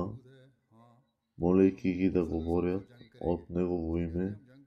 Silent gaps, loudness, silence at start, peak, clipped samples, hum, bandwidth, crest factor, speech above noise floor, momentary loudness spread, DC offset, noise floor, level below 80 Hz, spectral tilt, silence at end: none; -31 LUFS; 0 s; -12 dBFS; under 0.1%; none; 6.4 kHz; 20 dB; 37 dB; 12 LU; under 0.1%; -67 dBFS; -54 dBFS; -10 dB/octave; 0.3 s